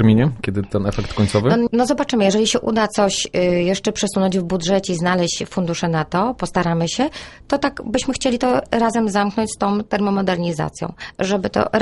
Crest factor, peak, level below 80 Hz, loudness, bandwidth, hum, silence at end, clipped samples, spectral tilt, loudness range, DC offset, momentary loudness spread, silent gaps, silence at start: 16 dB; -2 dBFS; -42 dBFS; -19 LUFS; 11.5 kHz; none; 0 s; under 0.1%; -5 dB/octave; 3 LU; under 0.1%; 6 LU; none; 0 s